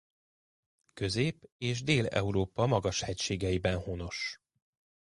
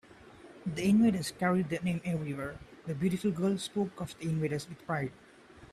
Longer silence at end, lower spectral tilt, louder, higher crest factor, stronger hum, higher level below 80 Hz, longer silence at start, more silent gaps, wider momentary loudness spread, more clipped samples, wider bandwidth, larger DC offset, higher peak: first, 0.75 s vs 0.05 s; second, -5 dB/octave vs -6.5 dB/octave; about the same, -32 LUFS vs -32 LUFS; about the same, 20 dB vs 16 dB; neither; first, -50 dBFS vs -62 dBFS; first, 0.95 s vs 0.2 s; first, 1.52-1.59 s vs none; second, 9 LU vs 13 LU; neither; second, 11.5 kHz vs 14 kHz; neither; first, -12 dBFS vs -16 dBFS